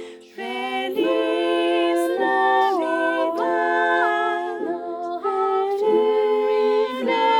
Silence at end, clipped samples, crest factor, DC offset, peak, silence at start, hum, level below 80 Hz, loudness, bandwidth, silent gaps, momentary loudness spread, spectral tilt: 0 s; under 0.1%; 12 dB; under 0.1%; -8 dBFS; 0 s; none; -70 dBFS; -21 LUFS; 17.5 kHz; none; 9 LU; -3.5 dB/octave